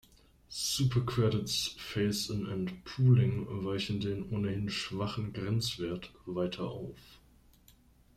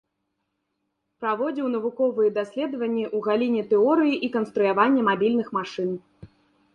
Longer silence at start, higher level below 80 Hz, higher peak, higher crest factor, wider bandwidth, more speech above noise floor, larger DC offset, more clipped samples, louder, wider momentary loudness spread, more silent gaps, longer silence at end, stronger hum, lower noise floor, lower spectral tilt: second, 0.5 s vs 1.2 s; first, -58 dBFS vs -68 dBFS; second, -14 dBFS vs -6 dBFS; about the same, 18 dB vs 18 dB; first, 15 kHz vs 7.2 kHz; second, 30 dB vs 55 dB; neither; neither; second, -33 LUFS vs -24 LUFS; about the same, 11 LU vs 9 LU; neither; first, 1 s vs 0.5 s; neither; second, -62 dBFS vs -77 dBFS; second, -5.5 dB/octave vs -7 dB/octave